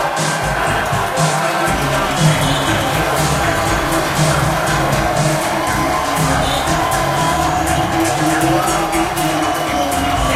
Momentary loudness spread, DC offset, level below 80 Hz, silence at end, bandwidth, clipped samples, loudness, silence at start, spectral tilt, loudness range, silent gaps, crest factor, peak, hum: 2 LU; under 0.1%; -30 dBFS; 0 s; 16.5 kHz; under 0.1%; -15 LUFS; 0 s; -4 dB/octave; 1 LU; none; 14 dB; 0 dBFS; none